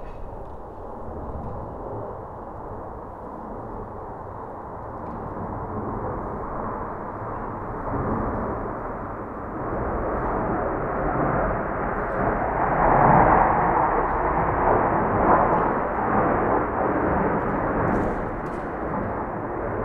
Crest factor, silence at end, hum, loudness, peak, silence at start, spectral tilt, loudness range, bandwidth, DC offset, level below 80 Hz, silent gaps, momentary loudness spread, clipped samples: 22 dB; 0 s; none; -24 LUFS; -2 dBFS; 0 s; -10.5 dB/octave; 15 LU; 6.4 kHz; under 0.1%; -36 dBFS; none; 17 LU; under 0.1%